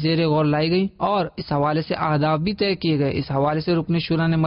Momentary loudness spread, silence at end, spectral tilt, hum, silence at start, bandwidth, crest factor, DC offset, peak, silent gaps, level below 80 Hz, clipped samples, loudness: 3 LU; 0 s; -12 dB/octave; none; 0 s; 5.6 kHz; 10 dB; under 0.1%; -10 dBFS; none; -48 dBFS; under 0.1%; -21 LUFS